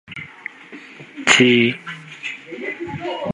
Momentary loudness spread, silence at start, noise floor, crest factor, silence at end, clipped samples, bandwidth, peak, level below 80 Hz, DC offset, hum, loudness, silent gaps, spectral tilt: 25 LU; 0.1 s; -40 dBFS; 22 dB; 0 s; under 0.1%; 11.5 kHz; 0 dBFS; -58 dBFS; under 0.1%; none; -17 LUFS; none; -3.5 dB/octave